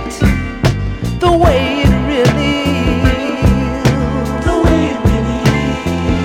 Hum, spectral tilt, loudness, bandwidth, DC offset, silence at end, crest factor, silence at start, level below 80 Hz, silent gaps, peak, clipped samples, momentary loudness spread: none; -6.5 dB/octave; -14 LUFS; 16.5 kHz; under 0.1%; 0 s; 10 dB; 0 s; -20 dBFS; none; -2 dBFS; under 0.1%; 5 LU